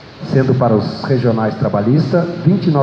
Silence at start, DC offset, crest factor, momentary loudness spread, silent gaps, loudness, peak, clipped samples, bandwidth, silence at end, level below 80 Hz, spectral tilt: 0 s; under 0.1%; 14 dB; 3 LU; none; -15 LUFS; 0 dBFS; under 0.1%; 6.8 kHz; 0 s; -50 dBFS; -9 dB/octave